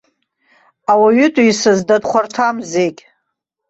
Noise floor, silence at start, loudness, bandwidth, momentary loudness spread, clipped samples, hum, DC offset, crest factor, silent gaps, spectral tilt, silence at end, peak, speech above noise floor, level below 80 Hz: -74 dBFS; 0.9 s; -14 LUFS; 8.2 kHz; 7 LU; under 0.1%; none; under 0.1%; 14 dB; none; -4.5 dB/octave; 0.75 s; -2 dBFS; 61 dB; -58 dBFS